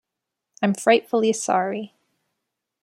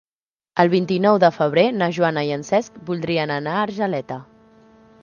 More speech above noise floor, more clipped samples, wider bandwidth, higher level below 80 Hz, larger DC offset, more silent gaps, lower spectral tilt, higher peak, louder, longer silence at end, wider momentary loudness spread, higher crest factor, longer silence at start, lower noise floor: second, 63 dB vs over 71 dB; neither; first, 13 kHz vs 7.2 kHz; second, -74 dBFS vs -64 dBFS; neither; neither; second, -4 dB/octave vs -6.5 dB/octave; second, -4 dBFS vs 0 dBFS; about the same, -21 LUFS vs -20 LUFS; first, 0.95 s vs 0.8 s; about the same, 12 LU vs 11 LU; about the same, 20 dB vs 20 dB; about the same, 0.6 s vs 0.55 s; second, -84 dBFS vs under -90 dBFS